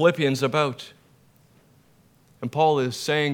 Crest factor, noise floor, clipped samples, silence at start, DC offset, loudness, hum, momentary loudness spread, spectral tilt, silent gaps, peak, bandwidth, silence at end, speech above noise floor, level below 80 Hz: 18 dB; -58 dBFS; under 0.1%; 0 s; under 0.1%; -23 LUFS; none; 16 LU; -5 dB/octave; none; -6 dBFS; 18 kHz; 0 s; 36 dB; -72 dBFS